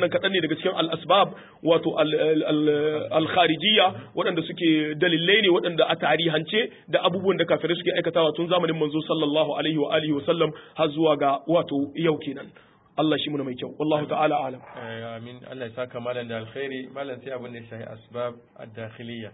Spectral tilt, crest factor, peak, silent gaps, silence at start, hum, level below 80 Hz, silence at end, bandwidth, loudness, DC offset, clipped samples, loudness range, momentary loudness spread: -10 dB/octave; 18 dB; -6 dBFS; none; 0 s; none; -68 dBFS; 0 s; 4 kHz; -23 LUFS; under 0.1%; under 0.1%; 12 LU; 15 LU